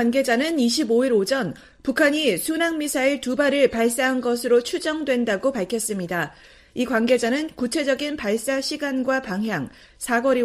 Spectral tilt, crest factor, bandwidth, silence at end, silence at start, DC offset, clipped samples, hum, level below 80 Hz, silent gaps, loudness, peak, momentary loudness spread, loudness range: -3.5 dB/octave; 16 dB; 15.5 kHz; 0 s; 0 s; under 0.1%; under 0.1%; none; -56 dBFS; none; -22 LUFS; -6 dBFS; 8 LU; 3 LU